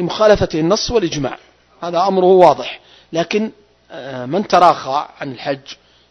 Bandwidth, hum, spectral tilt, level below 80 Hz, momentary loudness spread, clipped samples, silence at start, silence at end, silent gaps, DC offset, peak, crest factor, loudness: 9 kHz; none; -5 dB/octave; -42 dBFS; 17 LU; 0.2%; 0 s; 0.35 s; none; under 0.1%; 0 dBFS; 16 dB; -15 LUFS